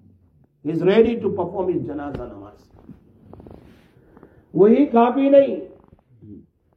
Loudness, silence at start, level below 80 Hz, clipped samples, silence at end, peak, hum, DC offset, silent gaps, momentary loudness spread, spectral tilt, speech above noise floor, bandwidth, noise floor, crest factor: -18 LUFS; 0.65 s; -54 dBFS; under 0.1%; 0.4 s; -2 dBFS; none; under 0.1%; none; 17 LU; -9.5 dB/octave; 39 dB; 5.4 kHz; -57 dBFS; 18 dB